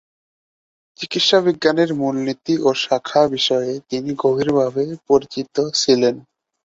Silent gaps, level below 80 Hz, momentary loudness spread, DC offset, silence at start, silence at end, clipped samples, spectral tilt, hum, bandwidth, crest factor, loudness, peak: none; -60 dBFS; 9 LU; under 0.1%; 1 s; 0.45 s; under 0.1%; -4 dB/octave; none; 7.8 kHz; 18 dB; -18 LUFS; -2 dBFS